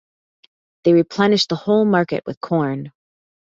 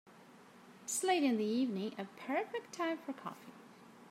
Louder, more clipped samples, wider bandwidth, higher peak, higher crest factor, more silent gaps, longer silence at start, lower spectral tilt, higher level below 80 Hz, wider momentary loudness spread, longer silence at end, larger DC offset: first, -18 LUFS vs -37 LUFS; neither; second, 7.8 kHz vs 16 kHz; first, -2 dBFS vs -20 dBFS; about the same, 18 dB vs 18 dB; first, 2.37-2.41 s vs none; first, 0.85 s vs 0.05 s; first, -6 dB/octave vs -3.5 dB/octave; first, -62 dBFS vs under -90 dBFS; second, 10 LU vs 23 LU; first, 0.6 s vs 0 s; neither